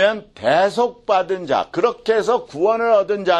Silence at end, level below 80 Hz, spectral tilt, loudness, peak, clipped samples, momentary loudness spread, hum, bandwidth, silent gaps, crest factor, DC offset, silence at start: 0 s; -58 dBFS; -4.5 dB/octave; -18 LUFS; -4 dBFS; under 0.1%; 4 LU; none; 11 kHz; none; 14 dB; under 0.1%; 0 s